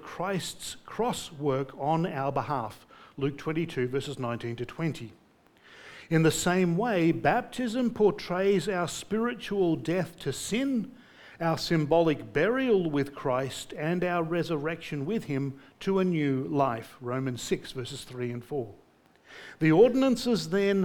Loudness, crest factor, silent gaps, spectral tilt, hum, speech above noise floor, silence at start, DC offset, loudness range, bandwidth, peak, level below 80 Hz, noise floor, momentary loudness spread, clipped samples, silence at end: -29 LUFS; 20 dB; none; -6 dB/octave; none; 31 dB; 0 s; under 0.1%; 5 LU; 18.5 kHz; -10 dBFS; -58 dBFS; -59 dBFS; 11 LU; under 0.1%; 0 s